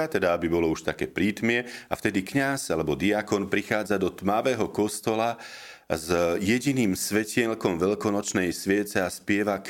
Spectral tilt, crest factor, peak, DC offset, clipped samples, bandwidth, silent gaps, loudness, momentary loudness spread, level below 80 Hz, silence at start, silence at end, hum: -4.5 dB/octave; 20 dB; -6 dBFS; under 0.1%; under 0.1%; 17 kHz; none; -26 LUFS; 5 LU; -54 dBFS; 0 s; 0 s; none